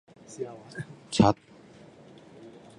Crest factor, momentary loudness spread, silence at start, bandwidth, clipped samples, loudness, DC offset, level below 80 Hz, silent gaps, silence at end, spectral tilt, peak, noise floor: 24 dB; 26 LU; 0.3 s; 11.5 kHz; under 0.1%; -27 LUFS; under 0.1%; -56 dBFS; none; 0.3 s; -6 dB/octave; -6 dBFS; -52 dBFS